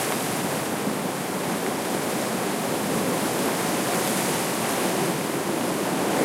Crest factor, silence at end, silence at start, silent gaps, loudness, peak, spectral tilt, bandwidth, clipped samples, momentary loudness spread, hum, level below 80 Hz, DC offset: 16 dB; 0 s; 0 s; none; -25 LUFS; -10 dBFS; -3.5 dB/octave; 16 kHz; under 0.1%; 3 LU; none; -64 dBFS; under 0.1%